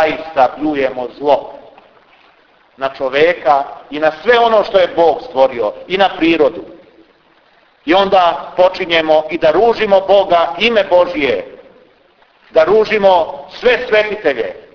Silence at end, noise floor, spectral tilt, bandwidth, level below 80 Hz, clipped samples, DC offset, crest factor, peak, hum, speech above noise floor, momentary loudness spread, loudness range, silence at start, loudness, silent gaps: 0.15 s; -51 dBFS; -5.5 dB/octave; 5.4 kHz; -48 dBFS; under 0.1%; under 0.1%; 14 dB; 0 dBFS; none; 38 dB; 9 LU; 5 LU; 0 s; -13 LUFS; none